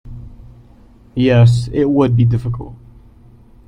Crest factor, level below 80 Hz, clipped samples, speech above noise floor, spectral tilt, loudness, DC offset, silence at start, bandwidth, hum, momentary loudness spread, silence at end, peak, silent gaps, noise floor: 16 dB; -38 dBFS; under 0.1%; 31 dB; -8.5 dB/octave; -14 LUFS; under 0.1%; 0.05 s; 9.8 kHz; none; 24 LU; 0.9 s; -2 dBFS; none; -44 dBFS